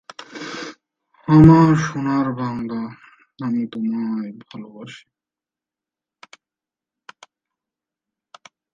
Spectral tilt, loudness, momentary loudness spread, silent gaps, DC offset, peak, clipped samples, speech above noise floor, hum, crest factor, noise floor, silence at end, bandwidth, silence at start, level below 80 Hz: -8 dB/octave; -17 LUFS; 26 LU; none; under 0.1%; 0 dBFS; under 0.1%; 72 dB; none; 20 dB; -89 dBFS; 3.75 s; 7.6 kHz; 0.2 s; -44 dBFS